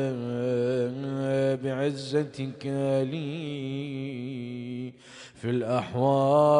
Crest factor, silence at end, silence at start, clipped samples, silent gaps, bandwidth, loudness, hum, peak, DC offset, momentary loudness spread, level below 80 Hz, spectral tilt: 18 dB; 0 s; 0 s; under 0.1%; none; 10.5 kHz; -29 LUFS; none; -10 dBFS; under 0.1%; 11 LU; -68 dBFS; -7.5 dB/octave